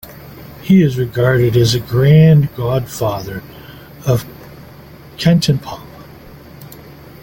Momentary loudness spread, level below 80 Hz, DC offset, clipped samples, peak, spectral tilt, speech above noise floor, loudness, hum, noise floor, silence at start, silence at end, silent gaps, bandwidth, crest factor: 25 LU; -42 dBFS; under 0.1%; under 0.1%; 0 dBFS; -7 dB/octave; 25 dB; -14 LUFS; none; -38 dBFS; 0.1 s; 0.3 s; none; 17 kHz; 14 dB